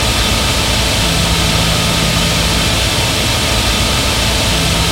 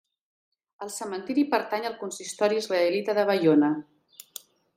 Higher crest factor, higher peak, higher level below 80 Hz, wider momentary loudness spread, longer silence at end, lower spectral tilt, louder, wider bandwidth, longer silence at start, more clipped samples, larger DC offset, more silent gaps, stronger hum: second, 12 dB vs 18 dB; first, 0 dBFS vs -8 dBFS; first, -20 dBFS vs -78 dBFS; second, 1 LU vs 20 LU; second, 0 s vs 0.95 s; second, -3 dB/octave vs -4.5 dB/octave; first, -12 LUFS vs -26 LUFS; about the same, 16.5 kHz vs 16 kHz; second, 0 s vs 0.8 s; neither; neither; neither; neither